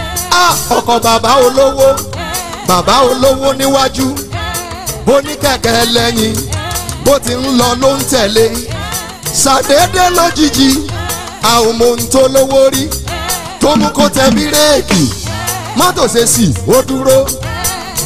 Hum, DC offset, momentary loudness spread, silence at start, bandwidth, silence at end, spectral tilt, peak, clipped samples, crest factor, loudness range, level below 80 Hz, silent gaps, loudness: none; under 0.1%; 9 LU; 0 s; 16 kHz; 0 s; -3.5 dB/octave; 0 dBFS; under 0.1%; 10 dB; 2 LU; -30 dBFS; none; -10 LUFS